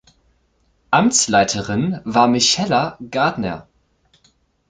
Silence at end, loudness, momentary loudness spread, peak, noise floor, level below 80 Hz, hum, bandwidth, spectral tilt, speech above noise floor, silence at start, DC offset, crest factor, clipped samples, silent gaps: 1.1 s; -17 LUFS; 10 LU; -2 dBFS; -62 dBFS; -50 dBFS; none; 9.6 kHz; -3.5 dB/octave; 45 dB; 0.9 s; under 0.1%; 18 dB; under 0.1%; none